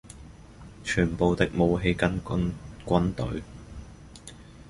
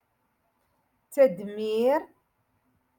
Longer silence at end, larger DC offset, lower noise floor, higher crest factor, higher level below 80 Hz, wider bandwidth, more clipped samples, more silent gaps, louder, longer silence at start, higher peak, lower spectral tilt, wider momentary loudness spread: second, 0.05 s vs 0.95 s; neither; second, -47 dBFS vs -73 dBFS; about the same, 22 dB vs 20 dB; first, -42 dBFS vs -76 dBFS; second, 11.5 kHz vs 17.5 kHz; neither; neither; about the same, -27 LUFS vs -26 LUFS; second, 0.05 s vs 1.1 s; first, -6 dBFS vs -10 dBFS; about the same, -6.5 dB/octave vs -5.5 dB/octave; first, 23 LU vs 10 LU